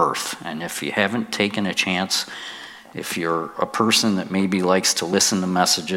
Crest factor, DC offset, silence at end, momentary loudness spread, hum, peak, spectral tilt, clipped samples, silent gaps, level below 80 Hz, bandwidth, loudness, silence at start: 18 dB; under 0.1%; 0 s; 12 LU; none; -2 dBFS; -3 dB/octave; under 0.1%; none; -66 dBFS; 16.5 kHz; -21 LUFS; 0 s